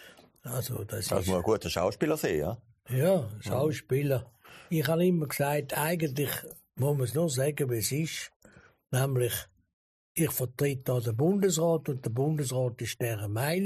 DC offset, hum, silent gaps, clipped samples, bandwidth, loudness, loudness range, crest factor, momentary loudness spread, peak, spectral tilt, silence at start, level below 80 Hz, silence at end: under 0.1%; none; 8.36-8.40 s, 9.73-10.15 s; under 0.1%; 15 kHz; -30 LUFS; 3 LU; 16 dB; 9 LU; -14 dBFS; -5.5 dB/octave; 0 s; -58 dBFS; 0 s